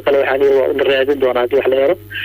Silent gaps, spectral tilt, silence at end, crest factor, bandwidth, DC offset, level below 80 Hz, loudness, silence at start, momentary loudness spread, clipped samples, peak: none; -6 dB/octave; 0 s; 10 dB; 16 kHz; under 0.1%; -50 dBFS; -14 LUFS; 0 s; 2 LU; under 0.1%; -4 dBFS